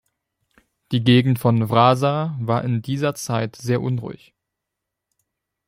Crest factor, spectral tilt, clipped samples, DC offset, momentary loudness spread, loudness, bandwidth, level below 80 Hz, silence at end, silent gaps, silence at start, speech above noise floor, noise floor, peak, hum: 20 dB; -6.5 dB/octave; under 0.1%; under 0.1%; 9 LU; -20 LUFS; 16 kHz; -58 dBFS; 1.5 s; none; 0.9 s; 63 dB; -82 dBFS; -2 dBFS; none